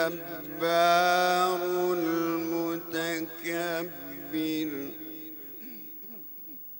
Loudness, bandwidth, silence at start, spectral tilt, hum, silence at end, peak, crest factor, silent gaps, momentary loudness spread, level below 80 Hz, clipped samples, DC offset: -28 LUFS; 16.5 kHz; 0 s; -4 dB/octave; none; 0 s; -10 dBFS; 20 dB; none; 17 LU; -78 dBFS; under 0.1%; under 0.1%